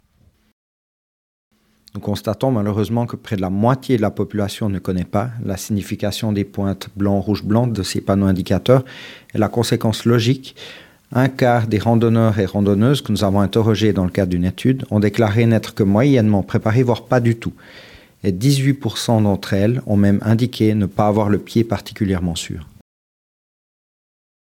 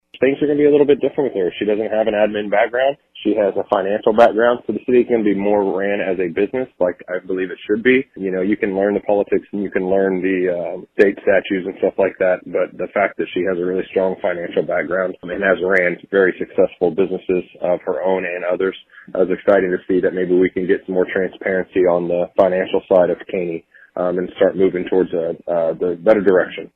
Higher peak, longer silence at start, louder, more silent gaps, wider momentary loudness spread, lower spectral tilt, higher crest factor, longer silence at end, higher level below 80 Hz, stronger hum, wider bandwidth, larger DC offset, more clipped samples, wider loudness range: about the same, 0 dBFS vs 0 dBFS; first, 1.95 s vs 0.15 s; about the same, -18 LUFS vs -18 LUFS; neither; about the same, 8 LU vs 7 LU; second, -7 dB/octave vs -8.5 dB/octave; about the same, 18 dB vs 16 dB; first, 1.95 s vs 0.1 s; about the same, -52 dBFS vs -54 dBFS; neither; first, 16.5 kHz vs 5 kHz; neither; neither; about the same, 5 LU vs 3 LU